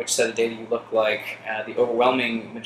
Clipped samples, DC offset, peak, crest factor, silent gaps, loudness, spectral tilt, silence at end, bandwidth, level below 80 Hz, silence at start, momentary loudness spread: under 0.1%; under 0.1%; -6 dBFS; 18 dB; none; -23 LUFS; -2.5 dB/octave; 0 s; 15 kHz; -66 dBFS; 0 s; 9 LU